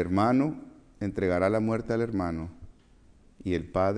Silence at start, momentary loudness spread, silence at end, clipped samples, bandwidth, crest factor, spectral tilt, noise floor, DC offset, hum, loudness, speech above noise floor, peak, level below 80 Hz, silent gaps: 0 s; 13 LU; 0 s; under 0.1%; 10.5 kHz; 16 dB; -8 dB/octave; -57 dBFS; under 0.1%; none; -28 LUFS; 30 dB; -12 dBFS; -52 dBFS; none